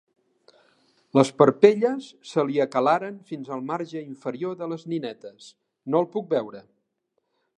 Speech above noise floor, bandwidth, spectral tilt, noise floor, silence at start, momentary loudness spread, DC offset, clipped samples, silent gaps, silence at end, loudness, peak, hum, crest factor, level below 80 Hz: 52 dB; 11 kHz; -6.5 dB/octave; -76 dBFS; 1.15 s; 18 LU; under 0.1%; under 0.1%; none; 1 s; -24 LUFS; -2 dBFS; none; 24 dB; -78 dBFS